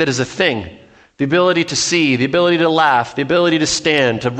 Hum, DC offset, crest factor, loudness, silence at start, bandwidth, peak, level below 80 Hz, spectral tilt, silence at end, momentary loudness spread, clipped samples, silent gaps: none; under 0.1%; 14 dB; -15 LUFS; 0 s; 9.2 kHz; 0 dBFS; -50 dBFS; -4 dB/octave; 0 s; 4 LU; under 0.1%; none